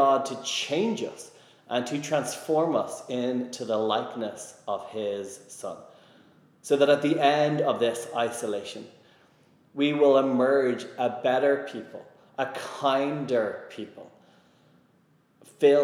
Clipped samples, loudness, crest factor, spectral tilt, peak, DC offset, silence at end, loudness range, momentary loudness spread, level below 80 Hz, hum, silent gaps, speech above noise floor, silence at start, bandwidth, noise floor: under 0.1%; -26 LUFS; 20 dB; -4.5 dB/octave; -8 dBFS; under 0.1%; 0 s; 6 LU; 18 LU; -86 dBFS; none; none; 37 dB; 0 s; 15 kHz; -64 dBFS